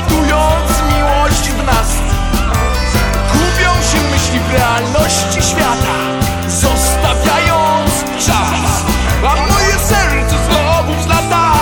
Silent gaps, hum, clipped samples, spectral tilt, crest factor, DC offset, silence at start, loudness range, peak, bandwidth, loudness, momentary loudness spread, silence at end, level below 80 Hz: none; none; under 0.1%; -4 dB/octave; 12 dB; under 0.1%; 0 s; 1 LU; 0 dBFS; 19 kHz; -12 LUFS; 3 LU; 0 s; -18 dBFS